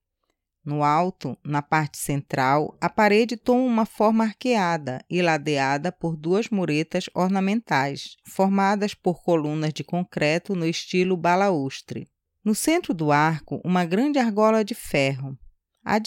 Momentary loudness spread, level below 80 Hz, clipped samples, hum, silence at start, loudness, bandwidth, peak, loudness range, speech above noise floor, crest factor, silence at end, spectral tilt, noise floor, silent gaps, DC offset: 8 LU; -58 dBFS; under 0.1%; none; 0.65 s; -23 LUFS; 17 kHz; -6 dBFS; 2 LU; 54 dB; 16 dB; 0 s; -5.5 dB/octave; -77 dBFS; none; under 0.1%